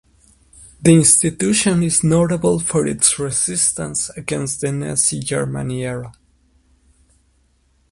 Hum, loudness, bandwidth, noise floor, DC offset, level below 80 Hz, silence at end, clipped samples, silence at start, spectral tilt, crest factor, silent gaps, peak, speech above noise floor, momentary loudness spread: none; -16 LUFS; 11.5 kHz; -59 dBFS; under 0.1%; -46 dBFS; 1.8 s; under 0.1%; 0.6 s; -4 dB/octave; 18 dB; none; 0 dBFS; 42 dB; 12 LU